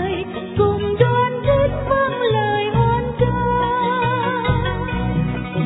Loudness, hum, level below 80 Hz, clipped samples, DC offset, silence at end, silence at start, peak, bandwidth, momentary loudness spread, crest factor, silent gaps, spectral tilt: -19 LUFS; none; -34 dBFS; under 0.1%; under 0.1%; 0 s; 0 s; -2 dBFS; 4 kHz; 5 LU; 16 dB; none; -10.5 dB/octave